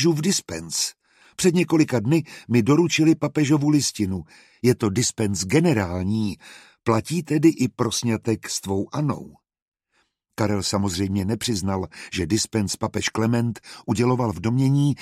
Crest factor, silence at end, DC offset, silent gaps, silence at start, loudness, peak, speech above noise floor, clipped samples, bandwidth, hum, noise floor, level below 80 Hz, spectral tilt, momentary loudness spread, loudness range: 18 dB; 0 s; under 0.1%; 9.62-9.72 s; 0 s; -22 LUFS; -6 dBFS; 48 dB; under 0.1%; 15 kHz; none; -69 dBFS; -54 dBFS; -5 dB/octave; 9 LU; 6 LU